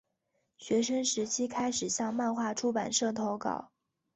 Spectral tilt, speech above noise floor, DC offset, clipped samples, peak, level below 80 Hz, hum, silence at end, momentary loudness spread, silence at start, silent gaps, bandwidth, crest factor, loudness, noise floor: -3 dB/octave; 48 dB; under 0.1%; under 0.1%; -16 dBFS; -72 dBFS; none; 0.5 s; 5 LU; 0.6 s; none; 8.4 kHz; 18 dB; -32 LUFS; -79 dBFS